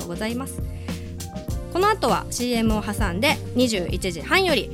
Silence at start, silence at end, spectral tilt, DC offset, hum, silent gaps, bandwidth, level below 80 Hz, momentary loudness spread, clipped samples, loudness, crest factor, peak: 0 s; 0 s; -4.5 dB/octave; under 0.1%; none; none; 17 kHz; -36 dBFS; 13 LU; under 0.1%; -23 LUFS; 18 dB; -6 dBFS